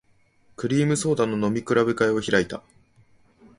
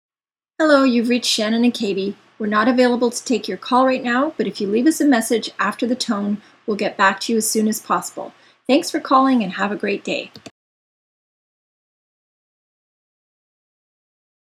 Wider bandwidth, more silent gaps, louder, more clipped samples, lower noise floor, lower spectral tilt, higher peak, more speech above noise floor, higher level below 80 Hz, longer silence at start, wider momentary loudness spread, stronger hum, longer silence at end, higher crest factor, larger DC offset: second, 11.5 kHz vs 15.5 kHz; neither; second, -23 LUFS vs -19 LUFS; neither; second, -60 dBFS vs under -90 dBFS; first, -5.5 dB/octave vs -3.5 dB/octave; second, -4 dBFS vs 0 dBFS; second, 37 dB vs over 72 dB; first, -56 dBFS vs -70 dBFS; about the same, 0.6 s vs 0.6 s; about the same, 10 LU vs 10 LU; neither; second, 1 s vs 4.1 s; about the same, 20 dB vs 20 dB; neither